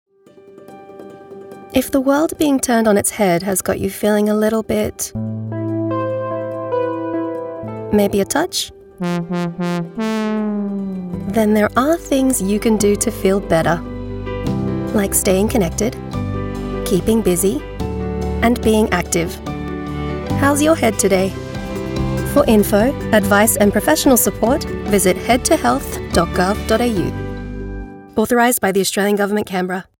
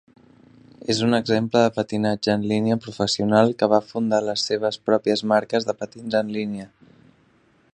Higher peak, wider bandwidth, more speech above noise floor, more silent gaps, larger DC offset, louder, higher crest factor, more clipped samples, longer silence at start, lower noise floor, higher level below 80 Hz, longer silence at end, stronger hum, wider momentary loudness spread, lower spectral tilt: about the same, -2 dBFS vs -2 dBFS; first, 17.5 kHz vs 10.5 kHz; second, 29 dB vs 38 dB; neither; neither; first, -17 LUFS vs -22 LUFS; second, 14 dB vs 20 dB; neither; second, 0.45 s vs 0.9 s; second, -45 dBFS vs -59 dBFS; first, -34 dBFS vs -60 dBFS; second, 0.15 s vs 1.05 s; neither; about the same, 11 LU vs 9 LU; about the same, -4.5 dB/octave vs -5.5 dB/octave